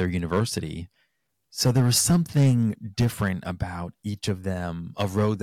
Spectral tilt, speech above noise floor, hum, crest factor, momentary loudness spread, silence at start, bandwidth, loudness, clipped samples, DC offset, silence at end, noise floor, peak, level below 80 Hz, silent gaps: -5 dB/octave; 50 dB; none; 14 dB; 14 LU; 0 s; 17 kHz; -25 LUFS; under 0.1%; under 0.1%; 0 s; -74 dBFS; -10 dBFS; -48 dBFS; none